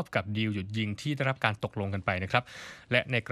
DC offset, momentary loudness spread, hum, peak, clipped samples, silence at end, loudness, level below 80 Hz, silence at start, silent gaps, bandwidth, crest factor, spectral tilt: under 0.1%; 6 LU; none; -8 dBFS; under 0.1%; 0 s; -30 LUFS; -62 dBFS; 0 s; none; 13 kHz; 22 dB; -6 dB/octave